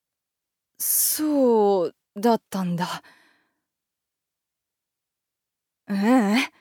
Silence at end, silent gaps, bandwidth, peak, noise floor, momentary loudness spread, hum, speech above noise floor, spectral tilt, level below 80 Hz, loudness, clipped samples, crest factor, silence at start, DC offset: 0.15 s; none; over 20 kHz; -8 dBFS; -86 dBFS; 11 LU; none; 64 dB; -4 dB/octave; -78 dBFS; -22 LUFS; under 0.1%; 18 dB; 0.8 s; under 0.1%